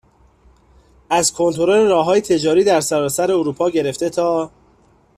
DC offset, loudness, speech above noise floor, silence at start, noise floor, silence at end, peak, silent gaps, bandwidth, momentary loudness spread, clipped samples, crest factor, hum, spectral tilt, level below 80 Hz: under 0.1%; -16 LUFS; 38 dB; 1.1 s; -54 dBFS; 0.7 s; -4 dBFS; none; 15 kHz; 6 LU; under 0.1%; 14 dB; none; -4 dB/octave; -54 dBFS